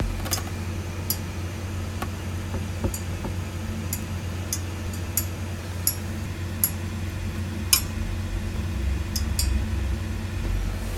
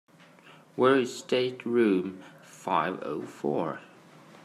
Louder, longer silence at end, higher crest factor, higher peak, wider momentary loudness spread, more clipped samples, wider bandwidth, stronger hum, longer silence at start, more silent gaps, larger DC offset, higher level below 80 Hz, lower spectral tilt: about the same, -28 LUFS vs -28 LUFS; second, 0 s vs 0.6 s; first, 28 dB vs 20 dB; first, 0 dBFS vs -10 dBFS; second, 7 LU vs 18 LU; neither; first, 17 kHz vs 13 kHz; neither; second, 0 s vs 0.45 s; neither; neither; first, -32 dBFS vs -80 dBFS; second, -4 dB/octave vs -5.5 dB/octave